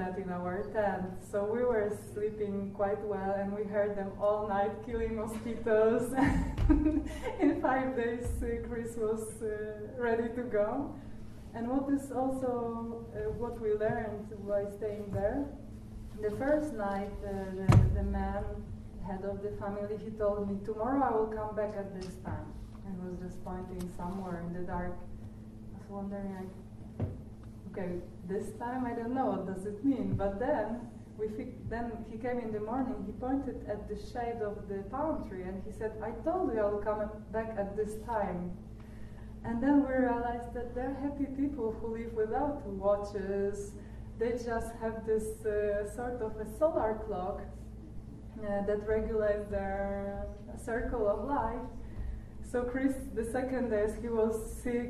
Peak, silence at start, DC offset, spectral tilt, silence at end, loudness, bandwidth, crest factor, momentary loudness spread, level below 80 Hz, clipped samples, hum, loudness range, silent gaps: -12 dBFS; 0 s; under 0.1%; -8 dB/octave; 0 s; -34 LUFS; 13 kHz; 22 dB; 13 LU; -46 dBFS; under 0.1%; none; 7 LU; none